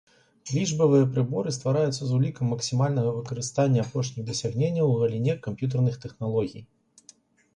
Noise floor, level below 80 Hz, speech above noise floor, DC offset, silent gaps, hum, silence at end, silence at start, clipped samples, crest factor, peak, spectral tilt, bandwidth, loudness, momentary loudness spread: -57 dBFS; -60 dBFS; 32 dB; under 0.1%; none; none; 0.9 s; 0.45 s; under 0.1%; 16 dB; -10 dBFS; -6.5 dB/octave; 10 kHz; -26 LUFS; 8 LU